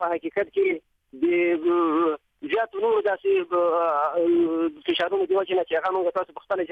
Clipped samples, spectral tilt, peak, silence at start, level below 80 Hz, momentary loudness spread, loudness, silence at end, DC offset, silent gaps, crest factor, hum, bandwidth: under 0.1%; -6.5 dB/octave; -10 dBFS; 0 s; -68 dBFS; 6 LU; -24 LUFS; 0 s; under 0.1%; none; 12 dB; none; 4.8 kHz